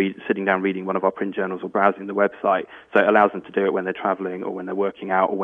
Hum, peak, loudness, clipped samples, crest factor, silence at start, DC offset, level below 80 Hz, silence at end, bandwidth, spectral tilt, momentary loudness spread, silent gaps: none; -2 dBFS; -22 LUFS; under 0.1%; 20 dB; 0 s; under 0.1%; -68 dBFS; 0 s; 4 kHz; -8.5 dB/octave; 8 LU; none